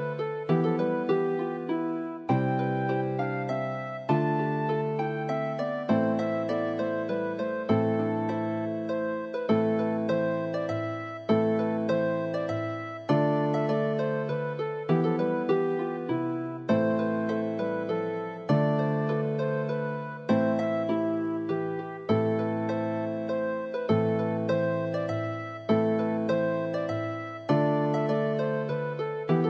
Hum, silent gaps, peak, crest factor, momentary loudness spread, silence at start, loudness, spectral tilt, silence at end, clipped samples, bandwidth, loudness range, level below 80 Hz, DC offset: none; none; -10 dBFS; 16 dB; 6 LU; 0 s; -28 LUFS; -9 dB/octave; 0 s; under 0.1%; 7.2 kHz; 1 LU; -74 dBFS; under 0.1%